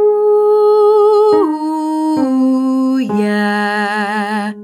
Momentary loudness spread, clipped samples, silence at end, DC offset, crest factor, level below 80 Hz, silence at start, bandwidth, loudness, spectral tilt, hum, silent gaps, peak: 7 LU; under 0.1%; 0 s; under 0.1%; 10 dB; -68 dBFS; 0 s; 11.5 kHz; -13 LUFS; -6.5 dB/octave; none; none; -2 dBFS